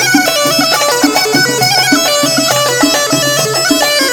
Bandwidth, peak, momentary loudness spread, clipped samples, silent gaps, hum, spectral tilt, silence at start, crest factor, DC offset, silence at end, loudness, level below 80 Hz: over 20 kHz; 0 dBFS; 2 LU; under 0.1%; none; none; -2 dB/octave; 0 s; 10 dB; under 0.1%; 0 s; -9 LUFS; -48 dBFS